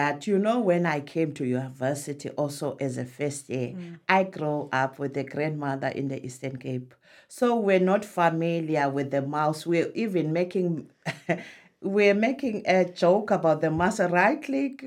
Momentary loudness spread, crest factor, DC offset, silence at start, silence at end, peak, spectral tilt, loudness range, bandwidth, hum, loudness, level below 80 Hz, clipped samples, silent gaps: 11 LU; 20 dB; under 0.1%; 0 s; 0 s; -6 dBFS; -6 dB/octave; 5 LU; 16 kHz; none; -26 LUFS; -66 dBFS; under 0.1%; none